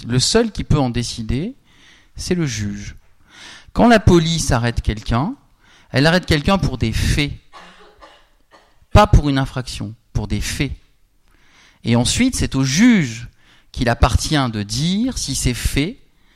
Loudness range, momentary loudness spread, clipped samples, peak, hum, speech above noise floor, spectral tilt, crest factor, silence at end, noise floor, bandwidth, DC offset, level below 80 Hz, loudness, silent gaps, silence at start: 4 LU; 15 LU; under 0.1%; 0 dBFS; none; 38 dB; -5 dB/octave; 18 dB; 0.4 s; -54 dBFS; 16 kHz; under 0.1%; -28 dBFS; -18 LUFS; none; 0 s